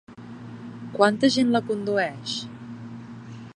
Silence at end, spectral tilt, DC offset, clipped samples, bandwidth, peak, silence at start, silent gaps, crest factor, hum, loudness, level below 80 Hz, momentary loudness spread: 0 s; -5 dB/octave; under 0.1%; under 0.1%; 10.5 kHz; -4 dBFS; 0.1 s; none; 22 dB; none; -23 LUFS; -66 dBFS; 21 LU